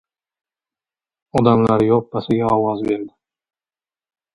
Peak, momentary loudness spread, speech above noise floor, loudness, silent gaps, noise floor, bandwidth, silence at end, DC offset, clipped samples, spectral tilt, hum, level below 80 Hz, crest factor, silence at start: 0 dBFS; 9 LU; over 74 dB; -18 LUFS; none; under -90 dBFS; 11 kHz; 1.25 s; under 0.1%; under 0.1%; -8.5 dB/octave; none; -50 dBFS; 20 dB; 1.35 s